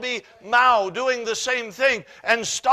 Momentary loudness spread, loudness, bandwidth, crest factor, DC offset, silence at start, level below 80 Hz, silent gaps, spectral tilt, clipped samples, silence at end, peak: 9 LU; -21 LUFS; 15 kHz; 18 dB; under 0.1%; 0 s; -64 dBFS; none; -1 dB/octave; under 0.1%; 0 s; -4 dBFS